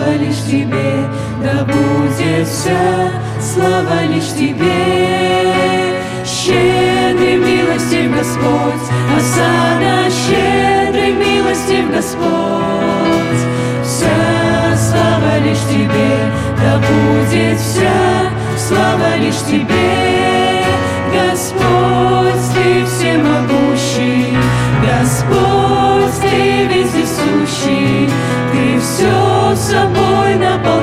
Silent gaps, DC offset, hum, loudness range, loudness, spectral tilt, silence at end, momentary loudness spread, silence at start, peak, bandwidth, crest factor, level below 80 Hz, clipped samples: none; under 0.1%; none; 2 LU; -13 LUFS; -5.5 dB/octave; 0 s; 4 LU; 0 s; -2 dBFS; 15.5 kHz; 10 dB; -36 dBFS; under 0.1%